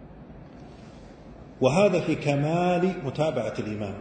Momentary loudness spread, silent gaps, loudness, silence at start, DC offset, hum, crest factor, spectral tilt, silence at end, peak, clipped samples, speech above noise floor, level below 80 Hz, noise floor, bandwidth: 25 LU; none; -25 LUFS; 0 s; under 0.1%; none; 20 dB; -7 dB/octave; 0 s; -6 dBFS; under 0.1%; 21 dB; -52 dBFS; -45 dBFS; 9.2 kHz